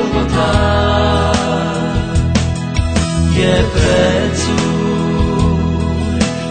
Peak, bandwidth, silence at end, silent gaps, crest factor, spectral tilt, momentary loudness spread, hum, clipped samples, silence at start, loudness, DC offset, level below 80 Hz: 0 dBFS; 9.2 kHz; 0 s; none; 14 dB; -5.5 dB/octave; 4 LU; none; under 0.1%; 0 s; -14 LUFS; 0.4%; -22 dBFS